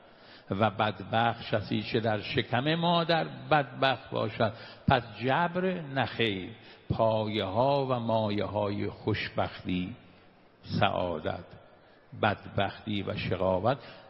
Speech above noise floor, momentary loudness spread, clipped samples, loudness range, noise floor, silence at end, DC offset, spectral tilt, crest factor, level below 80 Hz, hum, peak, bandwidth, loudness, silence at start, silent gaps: 29 dB; 7 LU; under 0.1%; 5 LU; -58 dBFS; 0 s; under 0.1%; -8.5 dB/octave; 22 dB; -58 dBFS; none; -8 dBFS; 5.8 kHz; -30 LUFS; 0.25 s; none